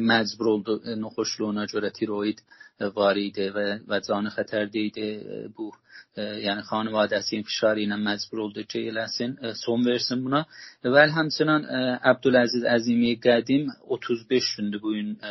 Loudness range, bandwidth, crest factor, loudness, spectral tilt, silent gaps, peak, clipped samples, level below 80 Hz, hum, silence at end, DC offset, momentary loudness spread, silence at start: 7 LU; 6.2 kHz; 22 dB; -25 LUFS; -3 dB/octave; none; -4 dBFS; under 0.1%; -68 dBFS; none; 0 s; under 0.1%; 11 LU; 0 s